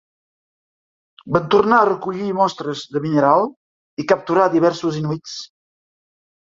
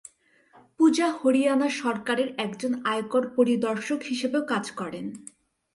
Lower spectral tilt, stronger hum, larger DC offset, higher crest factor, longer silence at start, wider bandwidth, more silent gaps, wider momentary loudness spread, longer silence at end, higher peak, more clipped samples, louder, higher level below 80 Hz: first, -6 dB/octave vs -4.5 dB/octave; neither; neither; about the same, 20 dB vs 16 dB; first, 1.25 s vs 0.8 s; second, 7.6 kHz vs 11.5 kHz; first, 3.56-3.97 s vs none; about the same, 13 LU vs 12 LU; first, 1.05 s vs 0.55 s; first, 0 dBFS vs -10 dBFS; neither; first, -18 LUFS vs -25 LUFS; first, -60 dBFS vs -72 dBFS